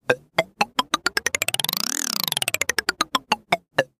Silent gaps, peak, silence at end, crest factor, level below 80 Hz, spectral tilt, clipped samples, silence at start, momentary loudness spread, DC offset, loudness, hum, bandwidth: none; -2 dBFS; 0.15 s; 24 dB; -60 dBFS; -1 dB/octave; under 0.1%; 0.1 s; 2 LU; under 0.1%; -23 LUFS; none; 15.5 kHz